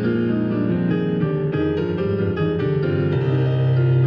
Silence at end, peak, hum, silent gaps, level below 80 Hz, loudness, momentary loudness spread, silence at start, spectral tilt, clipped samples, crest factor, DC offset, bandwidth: 0 s; -8 dBFS; none; none; -48 dBFS; -20 LUFS; 3 LU; 0 s; -10.5 dB/octave; under 0.1%; 10 dB; under 0.1%; 5.4 kHz